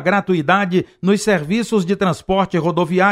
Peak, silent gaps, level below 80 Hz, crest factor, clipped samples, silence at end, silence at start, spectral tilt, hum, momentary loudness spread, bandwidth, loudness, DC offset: -2 dBFS; none; -48 dBFS; 14 dB; under 0.1%; 0 s; 0 s; -6 dB/octave; none; 3 LU; 13.5 kHz; -17 LUFS; under 0.1%